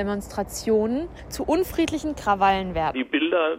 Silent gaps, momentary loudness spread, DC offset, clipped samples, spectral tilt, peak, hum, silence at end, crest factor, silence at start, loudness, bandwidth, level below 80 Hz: none; 9 LU; under 0.1%; under 0.1%; -5 dB/octave; -8 dBFS; none; 0 s; 16 dB; 0 s; -24 LUFS; 16 kHz; -42 dBFS